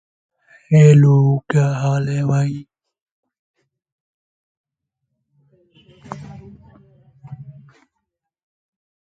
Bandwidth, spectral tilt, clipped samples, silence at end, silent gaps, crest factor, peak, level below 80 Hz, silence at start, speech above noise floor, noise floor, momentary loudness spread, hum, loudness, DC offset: 7.8 kHz; -8.5 dB/octave; under 0.1%; 1.65 s; 3.02-3.06 s, 3.12-3.23 s, 3.39-3.54 s, 3.92-4.64 s; 20 dB; 0 dBFS; -56 dBFS; 0.7 s; 64 dB; -78 dBFS; 27 LU; none; -15 LUFS; under 0.1%